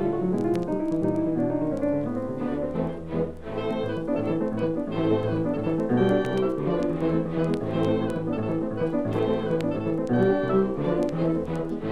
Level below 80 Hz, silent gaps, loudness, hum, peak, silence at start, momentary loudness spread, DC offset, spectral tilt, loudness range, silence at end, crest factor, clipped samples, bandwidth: -46 dBFS; none; -26 LUFS; none; -10 dBFS; 0 s; 6 LU; under 0.1%; -8.5 dB/octave; 3 LU; 0 s; 14 dB; under 0.1%; 10.5 kHz